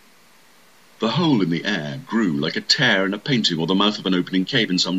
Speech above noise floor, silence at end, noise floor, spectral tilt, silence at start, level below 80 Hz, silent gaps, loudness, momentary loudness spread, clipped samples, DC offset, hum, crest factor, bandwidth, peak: 33 dB; 0 s; -53 dBFS; -4.5 dB/octave; 1 s; -64 dBFS; none; -20 LUFS; 7 LU; under 0.1%; 0.2%; none; 18 dB; 14.5 kHz; -4 dBFS